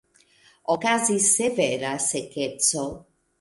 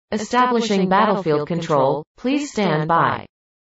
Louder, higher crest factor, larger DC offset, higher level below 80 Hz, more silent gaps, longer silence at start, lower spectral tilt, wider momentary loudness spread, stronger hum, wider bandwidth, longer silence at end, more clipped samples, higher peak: second, -22 LUFS vs -19 LUFS; about the same, 20 dB vs 16 dB; neither; about the same, -62 dBFS vs -58 dBFS; second, none vs 2.07-2.15 s; first, 0.7 s vs 0.1 s; second, -2 dB/octave vs -5.5 dB/octave; first, 11 LU vs 6 LU; neither; first, 12 kHz vs 8 kHz; about the same, 0.4 s vs 0.45 s; neither; about the same, -6 dBFS vs -4 dBFS